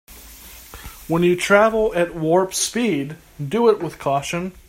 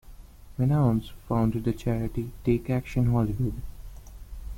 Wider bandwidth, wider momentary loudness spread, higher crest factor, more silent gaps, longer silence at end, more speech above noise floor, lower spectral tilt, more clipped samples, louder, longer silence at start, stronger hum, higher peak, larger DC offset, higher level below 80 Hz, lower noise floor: about the same, 16 kHz vs 16.5 kHz; about the same, 23 LU vs 21 LU; about the same, 20 dB vs 18 dB; neither; first, 0.15 s vs 0 s; about the same, 22 dB vs 20 dB; second, -4.5 dB/octave vs -9 dB/octave; neither; first, -19 LUFS vs -27 LUFS; about the same, 0.1 s vs 0.05 s; neither; first, 0 dBFS vs -10 dBFS; neither; second, -46 dBFS vs -40 dBFS; second, -41 dBFS vs -46 dBFS